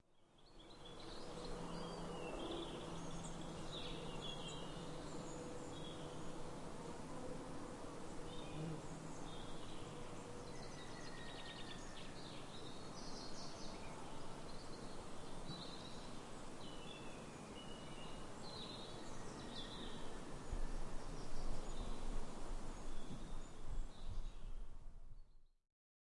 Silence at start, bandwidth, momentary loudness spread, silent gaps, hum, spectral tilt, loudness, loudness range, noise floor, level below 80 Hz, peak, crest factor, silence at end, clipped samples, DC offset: 0.1 s; 11.5 kHz; 5 LU; none; none; -4.5 dB/octave; -51 LUFS; 4 LU; -67 dBFS; -52 dBFS; -30 dBFS; 16 dB; 0.65 s; under 0.1%; under 0.1%